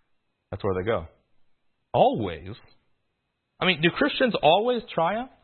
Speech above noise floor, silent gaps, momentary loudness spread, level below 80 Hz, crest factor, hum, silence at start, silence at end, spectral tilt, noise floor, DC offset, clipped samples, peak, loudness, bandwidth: 53 dB; none; 12 LU; -56 dBFS; 20 dB; none; 0.5 s; 0.15 s; -10 dB/octave; -77 dBFS; under 0.1%; under 0.1%; -6 dBFS; -24 LUFS; 4.4 kHz